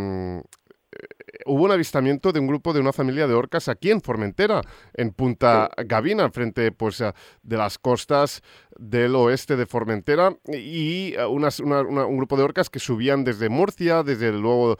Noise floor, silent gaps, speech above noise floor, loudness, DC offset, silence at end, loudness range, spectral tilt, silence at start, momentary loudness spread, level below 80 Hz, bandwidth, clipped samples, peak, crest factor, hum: -54 dBFS; none; 33 dB; -22 LUFS; under 0.1%; 0.05 s; 2 LU; -6.5 dB/octave; 0 s; 9 LU; -56 dBFS; 16.5 kHz; under 0.1%; -4 dBFS; 18 dB; none